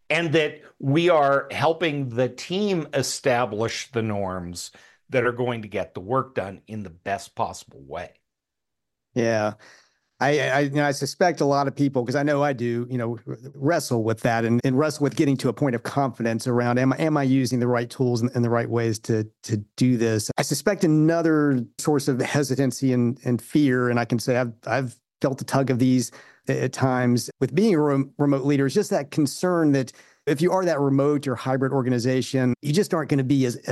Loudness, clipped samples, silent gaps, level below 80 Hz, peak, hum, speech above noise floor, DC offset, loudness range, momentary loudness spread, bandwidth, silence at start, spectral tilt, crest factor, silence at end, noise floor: -23 LUFS; under 0.1%; none; -64 dBFS; -6 dBFS; none; 62 dB; under 0.1%; 6 LU; 10 LU; 12.5 kHz; 0.1 s; -6 dB/octave; 16 dB; 0 s; -85 dBFS